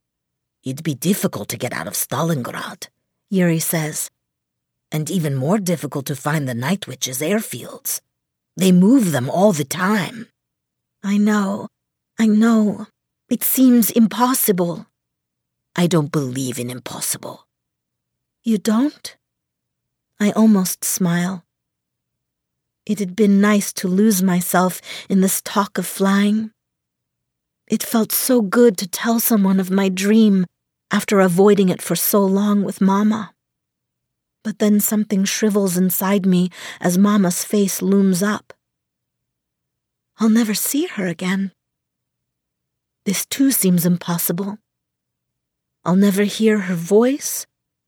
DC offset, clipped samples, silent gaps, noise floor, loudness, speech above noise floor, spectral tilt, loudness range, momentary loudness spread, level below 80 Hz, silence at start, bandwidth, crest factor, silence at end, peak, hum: under 0.1%; under 0.1%; none; -79 dBFS; -18 LUFS; 62 dB; -5 dB/octave; 6 LU; 13 LU; -70 dBFS; 0.65 s; over 20 kHz; 16 dB; 0.45 s; -2 dBFS; none